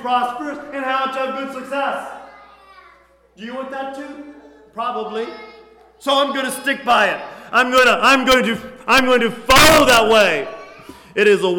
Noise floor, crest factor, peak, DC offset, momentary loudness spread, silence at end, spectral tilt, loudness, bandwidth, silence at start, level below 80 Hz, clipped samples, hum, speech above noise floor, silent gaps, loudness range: -51 dBFS; 14 dB; -4 dBFS; under 0.1%; 19 LU; 0 s; -2.5 dB/octave; -15 LUFS; 19 kHz; 0 s; -42 dBFS; under 0.1%; none; 34 dB; none; 16 LU